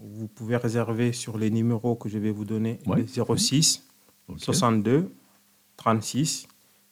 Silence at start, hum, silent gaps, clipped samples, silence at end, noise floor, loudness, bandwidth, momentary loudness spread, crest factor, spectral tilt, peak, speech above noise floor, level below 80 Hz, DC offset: 0 s; none; none; under 0.1%; 0.45 s; -61 dBFS; -25 LUFS; 16 kHz; 9 LU; 18 dB; -4.5 dB/octave; -8 dBFS; 36 dB; -62 dBFS; under 0.1%